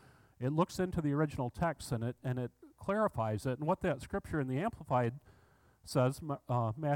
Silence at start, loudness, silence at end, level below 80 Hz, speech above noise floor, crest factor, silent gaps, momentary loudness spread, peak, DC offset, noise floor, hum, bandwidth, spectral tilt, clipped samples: 0.4 s; -36 LUFS; 0 s; -58 dBFS; 32 dB; 18 dB; none; 6 LU; -18 dBFS; under 0.1%; -66 dBFS; none; 17 kHz; -7 dB/octave; under 0.1%